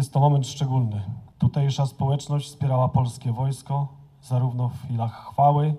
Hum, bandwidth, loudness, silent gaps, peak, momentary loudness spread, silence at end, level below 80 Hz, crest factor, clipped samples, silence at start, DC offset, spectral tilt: none; 12 kHz; -24 LUFS; none; -6 dBFS; 9 LU; 0 s; -54 dBFS; 18 dB; under 0.1%; 0 s; under 0.1%; -7.5 dB/octave